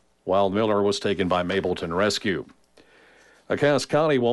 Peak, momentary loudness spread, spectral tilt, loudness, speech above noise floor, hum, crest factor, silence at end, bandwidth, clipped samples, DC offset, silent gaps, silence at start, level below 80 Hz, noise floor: -10 dBFS; 5 LU; -5 dB/octave; -23 LUFS; 32 dB; none; 14 dB; 0 s; 11.5 kHz; under 0.1%; under 0.1%; none; 0.25 s; -58 dBFS; -55 dBFS